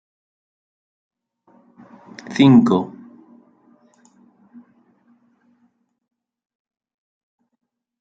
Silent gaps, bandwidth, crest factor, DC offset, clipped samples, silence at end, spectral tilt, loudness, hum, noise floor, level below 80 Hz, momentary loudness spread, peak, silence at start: none; 7.8 kHz; 22 dB; under 0.1%; under 0.1%; 5.15 s; -7.5 dB/octave; -15 LUFS; none; -65 dBFS; -66 dBFS; 28 LU; -2 dBFS; 2.3 s